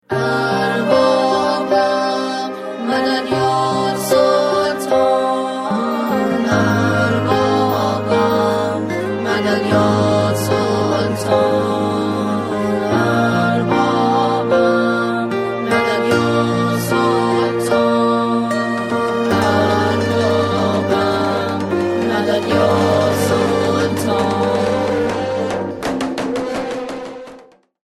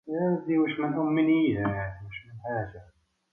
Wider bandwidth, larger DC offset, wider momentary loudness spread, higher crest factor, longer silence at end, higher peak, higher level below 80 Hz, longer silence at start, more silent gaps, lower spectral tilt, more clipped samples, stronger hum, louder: first, 16 kHz vs 3.6 kHz; neither; second, 6 LU vs 16 LU; about the same, 16 dB vs 14 dB; about the same, 0.45 s vs 0.5 s; first, 0 dBFS vs -14 dBFS; about the same, -52 dBFS vs -56 dBFS; about the same, 0.1 s vs 0.05 s; neither; second, -5.5 dB/octave vs -10 dB/octave; neither; neither; first, -16 LUFS vs -27 LUFS